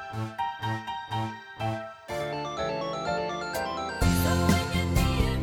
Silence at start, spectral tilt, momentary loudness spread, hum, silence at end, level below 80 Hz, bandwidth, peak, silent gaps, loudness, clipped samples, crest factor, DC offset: 0 s; -5.5 dB/octave; 10 LU; none; 0 s; -36 dBFS; 18 kHz; -10 dBFS; none; -29 LUFS; under 0.1%; 18 dB; under 0.1%